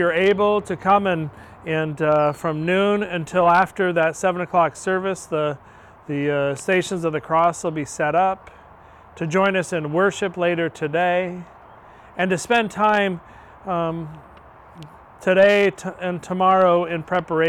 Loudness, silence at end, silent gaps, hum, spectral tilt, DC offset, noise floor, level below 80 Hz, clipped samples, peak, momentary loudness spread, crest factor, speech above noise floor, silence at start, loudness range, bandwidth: -20 LUFS; 0 s; none; none; -5.5 dB/octave; under 0.1%; -46 dBFS; -56 dBFS; under 0.1%; -4 dBFS; 11 LU; 16 dB; 26 dB; 0 s; 3 LU; 13.5 kHz